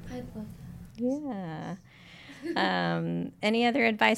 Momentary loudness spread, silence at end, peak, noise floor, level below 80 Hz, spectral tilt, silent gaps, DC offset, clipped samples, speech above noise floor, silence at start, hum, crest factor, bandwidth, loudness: 20 LU; 0 s; -8 dBFS; -50 dBFS; -58 dBFS; -6 dB/octave; none; under 0.1%; under 0.1%; 21 dB; 0 s; none; 22 dB; 14 kHz; -29 LUFS